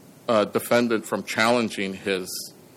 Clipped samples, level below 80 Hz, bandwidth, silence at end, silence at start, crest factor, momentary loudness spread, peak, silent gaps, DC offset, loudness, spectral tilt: under 0.1%; -70 dBFS; 17 kHz; 0.25 s; 0.25 s; 16 dB; 7 LU; -8 dBFS; none; under 0.1%; -24 LUFS; -4 dB/octave